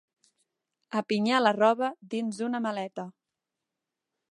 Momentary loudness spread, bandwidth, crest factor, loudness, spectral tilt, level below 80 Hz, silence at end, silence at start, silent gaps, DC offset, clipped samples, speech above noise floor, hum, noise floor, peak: 13 LU; 11.5 kHz; 22 dB; -28 LUFS; -5 dB/octave; -82 dBFS; 1.2 s; 0.9 s; none; under 0.1%; under 0.1%; 60 dB; none; -87 dBFS; -8 dBFS